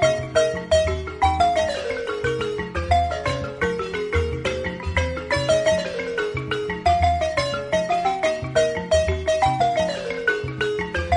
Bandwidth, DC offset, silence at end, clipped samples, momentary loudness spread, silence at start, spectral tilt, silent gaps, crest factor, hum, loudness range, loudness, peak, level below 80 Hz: 11 kHz; under 0.1%; 0 s; under 0.1%; 6 LU; 0 s; -4.5 dB/octave; none; 16 dB; none; 3 LU; -22 LUFS; -6 dBFS; -34 dBFS